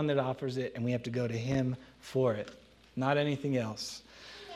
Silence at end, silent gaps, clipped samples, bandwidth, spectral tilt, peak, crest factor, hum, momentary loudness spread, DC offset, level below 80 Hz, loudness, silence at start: 0 s; none; under 0.1%; 13.5 kHz; -6.5 dB/octave; -14 dBFS; 20 dB; none; 14 LU; under 0.1%; -64 dBFS; -33 LUFS; 0 s